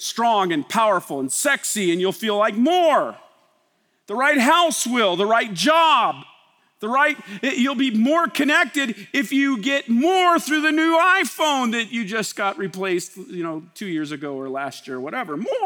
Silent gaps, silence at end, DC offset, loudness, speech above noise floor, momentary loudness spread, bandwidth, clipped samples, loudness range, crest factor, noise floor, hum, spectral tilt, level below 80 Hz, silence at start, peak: none; 0 s; under 0.1%; -20 LUFS; 46 dB; 13 LU; over 20 kHz; under 0.1%; 6 LU; 16 dB; -66 dBFS; none; -3 dB/octave; -82 dBFS; 0 s; -4 dBFS